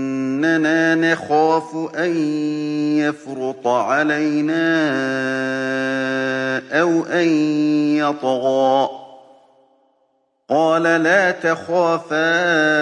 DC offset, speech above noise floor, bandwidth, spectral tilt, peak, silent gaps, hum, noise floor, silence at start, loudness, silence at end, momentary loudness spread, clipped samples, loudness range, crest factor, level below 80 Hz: under 0.1%; 47 dB; 9.8 kHz; -5.5 dB/octave; -4 dBFS; none; none; -65 dBFS; 0 s; -18 LUFS; 0 s; 6 LU; under 0.1%; 2 LU; 14 dB; -72 dBFS